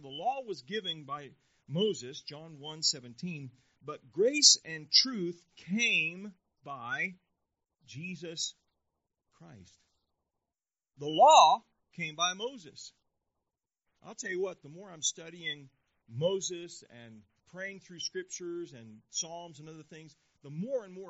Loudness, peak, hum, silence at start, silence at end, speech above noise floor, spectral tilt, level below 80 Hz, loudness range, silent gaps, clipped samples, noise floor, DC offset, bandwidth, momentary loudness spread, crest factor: -29 LUFS; -6 dBFS; none; 0.05 s; 0 s; over 58 dB; -1 dB/octave; -84 dBFS; 14 LU; none; under 0.1%; under -90 dBFS; under 0.1%; 8 kHz; 25 LU; 26 dB